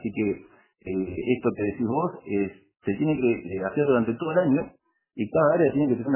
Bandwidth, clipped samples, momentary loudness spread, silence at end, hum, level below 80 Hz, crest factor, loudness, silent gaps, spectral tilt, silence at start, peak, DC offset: 3.2 kHz; under 0.1%; 11 LU; 0 s; none; -56 dBFS; 16 dB; -25 LUFS; none; -12 dB/octave; 0 s; -10 dBFS; under 0.1%